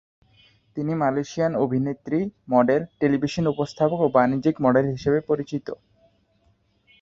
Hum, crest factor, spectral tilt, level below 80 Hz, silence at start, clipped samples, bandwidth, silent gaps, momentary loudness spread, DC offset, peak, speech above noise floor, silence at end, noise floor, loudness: none; 20 dB; -7.5 dB/octave; -56 dBFS; 0.75 s; under 0.1%; 7.8 kHz; none; 10 LU; under 0.1%; -4 dBFS; 42 dB; 1.25 s; -64 dBFS; -23 LUFS